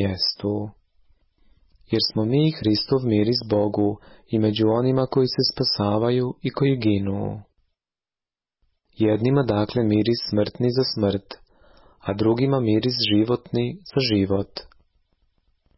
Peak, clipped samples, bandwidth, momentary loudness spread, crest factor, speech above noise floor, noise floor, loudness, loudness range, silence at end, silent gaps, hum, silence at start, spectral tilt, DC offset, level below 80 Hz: -8 dBFS; under 0.1%; 6 kHz; 9 LU; 14 dB; over 68 dB; under -90 dBFS; -22 LUFS; 3 LU; 1.1 s; none; none; 0 s; -9.5 dB/octave; under 0.1%; -50 dBFS